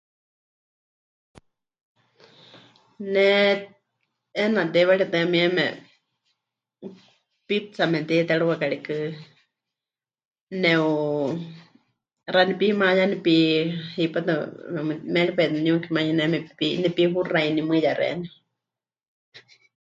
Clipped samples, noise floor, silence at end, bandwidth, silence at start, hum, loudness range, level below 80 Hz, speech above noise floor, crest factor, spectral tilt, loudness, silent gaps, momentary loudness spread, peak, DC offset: under 0.1%; under -90 dBFS; 0.5 s; 7.6 kHz; 3 s; none; 4 LU; -70 dBFS; over 68 dB; 20 dB; -6.5 dB/octave; -22 LUFS; 10.25-10.31 s, 10.41-10.47 s, 19.08-19.32 s; 14 LU; -4 dBFS; under 0.1%